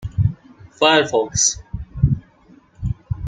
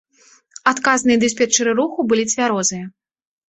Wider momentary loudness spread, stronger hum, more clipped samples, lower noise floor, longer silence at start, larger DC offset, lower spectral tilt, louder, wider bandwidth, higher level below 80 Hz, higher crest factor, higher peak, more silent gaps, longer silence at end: first, 16 LU vs 6 LU; neither; neither; about the same, -50 dBFS vs -53 dBFS; second, 0 s vs 0.65 s; neither; about the same, -3.5 dB/octave vs -2.5 dB/octave; about the same, -18 LUFS vs -17 LUFS; first, 9.6 kHz vs 8.4 kHz; first, -34 dBFS vs -60 dBFS; about the same, 18 dB vs 18 dB; about the same, -2 dBFS vs -2 dBFS; neither; second, 0 s vs 0.6 s